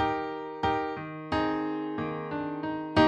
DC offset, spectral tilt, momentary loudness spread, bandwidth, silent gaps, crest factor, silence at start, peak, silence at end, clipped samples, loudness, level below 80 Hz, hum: under 0.1%; -7 dB/octave; 5 LU; 9 kHz; none; 20 dB; 0 s; -10 dBFS; 0 s; under 0.1%; -32 LUFS; -52 dBFS; none